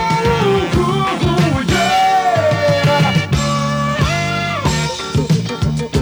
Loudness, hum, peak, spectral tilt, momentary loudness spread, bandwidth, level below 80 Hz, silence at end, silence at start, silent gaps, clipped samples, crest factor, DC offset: -15 LUFS; none; -2 dBFS; -5.5 dB/octave; 5 LU; 20 kHz; -32 dBFS; 0 s; 0 s; none; under 0.1%; 12 dB; under 0.1%